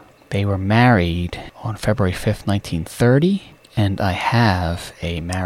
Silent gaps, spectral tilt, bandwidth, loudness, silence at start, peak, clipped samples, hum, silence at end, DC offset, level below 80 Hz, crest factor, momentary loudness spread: none; -6.5 dB/octave; 15 kHz; -19 LUFS; 0.3 s; -2 dBFS; under 0.1%; none; 0 s; under 0.1%; -38 dBFS; 16 dB; 12 LU